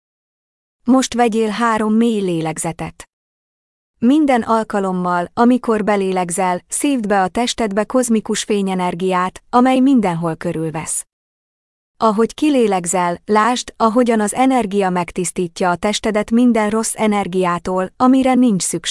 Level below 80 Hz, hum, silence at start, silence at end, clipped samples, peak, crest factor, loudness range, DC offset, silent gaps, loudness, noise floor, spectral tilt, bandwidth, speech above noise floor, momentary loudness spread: -50 dBFS; none; 0.85 s; 0 s; under 0.1%; -2 dBFS; 14 dB; 2 LU; under 0.1%; 3.13-3.94 s, 11.13-11.94 s; -16 LUFS; under -90 dBFS; -4.5 dB/octave; 12 kHz; over 74 dB; 7 LU